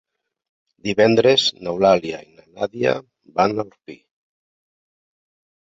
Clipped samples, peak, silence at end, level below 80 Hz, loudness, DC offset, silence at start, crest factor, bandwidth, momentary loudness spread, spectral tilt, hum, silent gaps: under 0.1%; -2 dBFS; 1.65 s; -58 dBFS; -19 LUFS; under 0.1%; 0.85 s; 20 dB; 7.8 kHz; 16 LU; -4.5 dB/octave; none; none